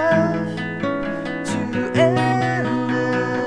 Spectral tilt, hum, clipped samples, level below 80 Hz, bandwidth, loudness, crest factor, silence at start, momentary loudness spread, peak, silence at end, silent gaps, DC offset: -6.5 dB/octave; none; under 0.1%; -50 dBFS; 10.5 kHz; -21 LUFS; 16 dB; 0 s; 8 LU; -4 dBFS; 0 s; none; 0.5%